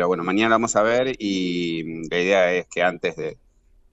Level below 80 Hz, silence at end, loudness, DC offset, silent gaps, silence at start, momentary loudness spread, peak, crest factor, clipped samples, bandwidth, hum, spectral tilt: -54 dBFS; 0.6 s; -21 LUFS; under 0.1%; none; 0 s; 9 LU; -4 dBFS; 18 dB; under 0.1%; 8.2 kHz; none; -4 dB/octave